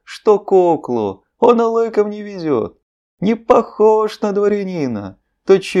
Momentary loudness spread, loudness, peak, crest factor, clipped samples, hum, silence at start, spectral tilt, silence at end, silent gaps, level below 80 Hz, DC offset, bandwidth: 11 LU; -16 LUFS; 0 dBFS; 16 dB; under 0.1%; none; 0.1 s; -7 dB/octave; 0 s; 2.83-3.18 s; -56 dBFS; under 0.1%; 11 kHz